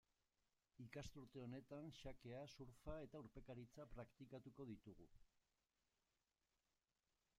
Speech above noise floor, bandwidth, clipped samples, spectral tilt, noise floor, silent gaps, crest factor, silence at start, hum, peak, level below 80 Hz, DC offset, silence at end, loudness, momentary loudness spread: over 32 dB; 14.5 kHz; under 0.1%; -6.5 dB/octave; under -90 dBFS; none; 20 dB; 0.8 s; none; -40 dBFS; -72 dBFS; under 0.1%; 2 s; -59 LUFS; 4 LU